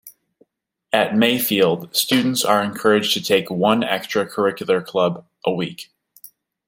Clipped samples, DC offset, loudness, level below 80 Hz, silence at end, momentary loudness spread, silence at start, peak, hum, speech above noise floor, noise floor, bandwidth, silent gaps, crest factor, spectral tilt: under 0.1%; under 0.1%; -19 LUFS; -66 dBFS; 0.85 s; 7 LU; 0.05 s; 0 dBFS; none; 47 dB; -66 dBFS; 16.5 kHz; none; 20 dB; -4 dB/octave